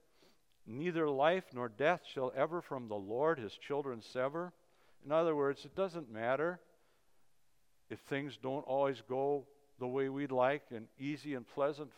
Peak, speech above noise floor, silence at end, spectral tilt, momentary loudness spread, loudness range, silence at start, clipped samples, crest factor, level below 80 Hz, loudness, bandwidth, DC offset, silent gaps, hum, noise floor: -16 dBFS; 42 dB; 0.1 s; -6.5 dB/octave; 11 LU; 4 LU; 0.65 s; under 0.1%; 22 dB; -82 dBFS; -37 LUFS; 13 kHz; under 0.1%; none; none; -79 dBFS